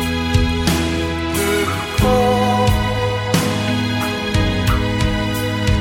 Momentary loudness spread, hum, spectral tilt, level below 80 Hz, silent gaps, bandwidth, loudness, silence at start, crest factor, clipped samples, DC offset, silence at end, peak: 5 LU; none; -5 dB/octave; -26 dBFS; none; 16.5 kHz; -18 LUFS; 0 s; 16 dB; under 0.1%; under 0.1%; 0 s; -2 dBFS